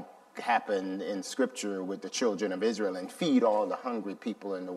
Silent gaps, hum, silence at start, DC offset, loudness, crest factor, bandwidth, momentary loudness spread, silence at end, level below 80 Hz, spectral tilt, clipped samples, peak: none; none; 0 s; under 0.1%; -31 LUFS; 18 dB; 13.5 kHz; 10 LU; 0 s; -84 dBFS; -4.5 dB/octave; under 0.1%; -14 dBFS